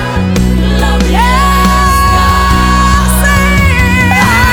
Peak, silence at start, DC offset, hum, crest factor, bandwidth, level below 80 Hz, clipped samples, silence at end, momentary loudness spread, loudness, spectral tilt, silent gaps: 0 dBFS; 0 s; under 0.1%; none; 8 dB; 20 kHz; -12 dBFS; 0.4%; 0 s; 3 LU; -8 LUFS; -5 dB/octave; none